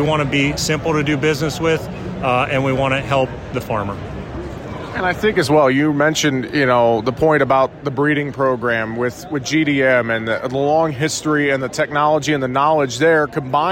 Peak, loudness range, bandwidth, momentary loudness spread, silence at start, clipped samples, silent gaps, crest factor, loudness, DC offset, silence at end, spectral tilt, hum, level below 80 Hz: -4 dBFS; 4 LU; 16.5 kHz; 8 LU; 0 s; under 0.1%; none; 14 dB; -17 LUFS; under 0.1%; 0 s; -5 dB/octave; none; -42 dBFS